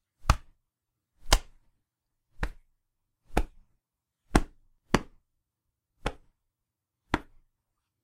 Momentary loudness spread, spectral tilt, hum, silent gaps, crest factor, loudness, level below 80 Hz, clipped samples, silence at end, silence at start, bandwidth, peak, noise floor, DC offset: 12 LU; -4 dB/octave; none; none; 34 dB; -32 LUFS; -38 dBFS; under 0.1%; 0.8 s; 0.25 s; 16 kHz; 0 dBFS; -86 dBFS; under 0.1%